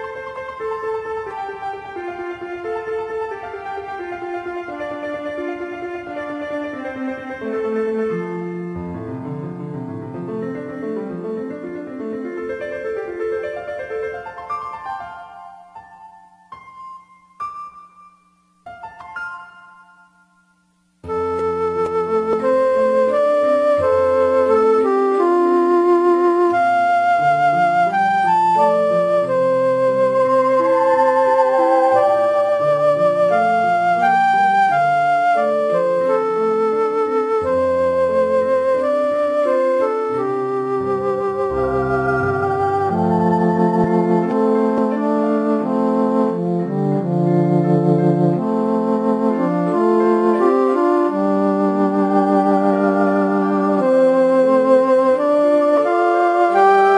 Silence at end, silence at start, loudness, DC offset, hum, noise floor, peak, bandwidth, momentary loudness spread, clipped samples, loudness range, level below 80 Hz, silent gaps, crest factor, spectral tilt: 0 s; 0 s; -17 LUFS; under 0.1%; none; -61 dBFS; -2 dBFS; 10.5 kHz; 14 LU; under 0.1%; 13 LU; -54 dBFS; none; 16 dB; -8 dB/octave